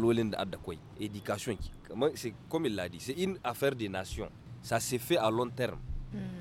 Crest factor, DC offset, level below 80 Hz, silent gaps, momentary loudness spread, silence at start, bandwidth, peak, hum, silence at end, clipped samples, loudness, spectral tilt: 20 dB; under 0.1%; -50 dBFS; none; 13 LU; 0 s; 16.5 kHz; -14 dBFS; none; 0 s; under 0.1%; -35 LUFS; -5 dB/octave